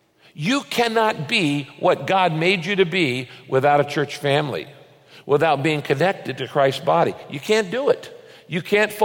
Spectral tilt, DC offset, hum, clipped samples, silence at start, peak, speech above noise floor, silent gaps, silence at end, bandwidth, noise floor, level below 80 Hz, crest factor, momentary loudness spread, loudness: -5 dB/octave; under 0.1%; none; under 0.1%; 0.35 s; -4 dBFS; 28 dB; none; 0 s; 17 kHz; -48 dBFS; -66 dBFS; 16 dB; 10 LU; -20 LUFS